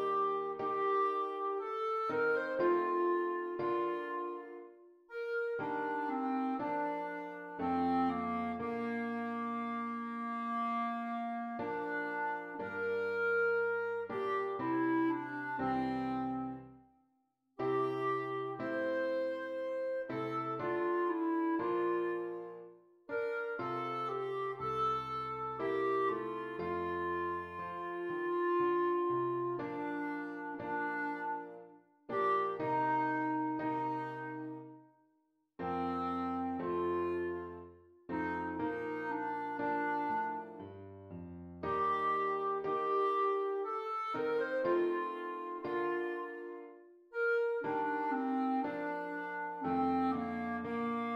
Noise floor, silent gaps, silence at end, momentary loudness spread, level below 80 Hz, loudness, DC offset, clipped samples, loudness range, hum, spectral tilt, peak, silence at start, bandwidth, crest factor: -78 dBFS; none; 0 s; 10 LU; -72 dBFS; -36 LUFS; under 0.1%; under 0.1%; 4 LU; none; -7.5 dB/octave; -22 dBFS; 0 s; 6.6 kHz; 14 dB